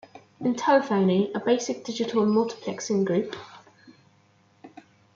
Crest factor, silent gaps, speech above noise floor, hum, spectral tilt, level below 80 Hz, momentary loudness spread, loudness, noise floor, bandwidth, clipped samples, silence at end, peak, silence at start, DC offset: 18 dB; none; 37 dB; none; -5.5 dB/octave; -72 dBFS; 9 LU; -25 LUFS; -61 dBFS; 7.6 kHz; under 0.1%; 0.45 s; -8 dBFS; 0.15 s; under 0.1%